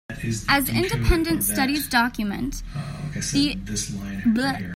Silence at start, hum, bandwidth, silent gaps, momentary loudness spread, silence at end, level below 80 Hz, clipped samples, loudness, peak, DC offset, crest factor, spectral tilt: 0.1 s; none; 16.5 kHz; none; 9 LU; 0 s; -34 dBFS; under 0.1%; -23 LUFS; -4 dBFS; under 0.1%; 18 dB; -4 dB/octave